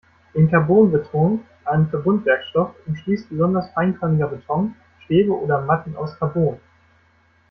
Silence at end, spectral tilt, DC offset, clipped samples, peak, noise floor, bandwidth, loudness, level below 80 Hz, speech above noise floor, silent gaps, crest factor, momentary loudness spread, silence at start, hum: 0.95 s; -10.5 dB/octave; under 0.1%; under 0.1%; -2 dBFS; -58 dBFS; 5.8 kHz; -20 LUFS; -54 dBFS; 39 dB; none; 18 dB; 10 LU; 0.35 s; none